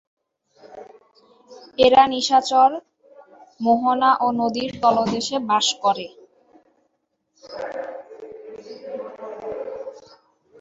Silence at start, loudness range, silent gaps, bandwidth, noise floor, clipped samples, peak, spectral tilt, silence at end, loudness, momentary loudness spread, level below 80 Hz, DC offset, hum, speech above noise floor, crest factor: 0.7 s; 16 LU; none; 8 kHz; -72 dBFS; under 0.1%; -2 dBFS; -3 dB/octave; 0.6 s; -19 LUFS; 23 LU; -62 dBFS; under 0.1%; none; 54 dB; 20 dB